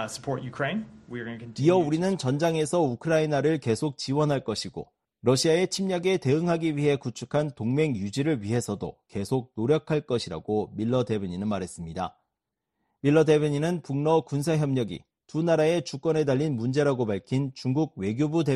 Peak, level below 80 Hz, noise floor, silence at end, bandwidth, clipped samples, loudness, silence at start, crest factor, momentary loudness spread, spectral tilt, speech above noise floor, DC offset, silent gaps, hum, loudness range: -10 dBFS; -60 dBFS; -84 dBFS; 0 s; 12.5 kHz; under 0.1%; -26 LUFS; 0 s; 16 dB; 11 LU; -6 dB/octave; 59 dB; under 0.1%; none; none; 3 LU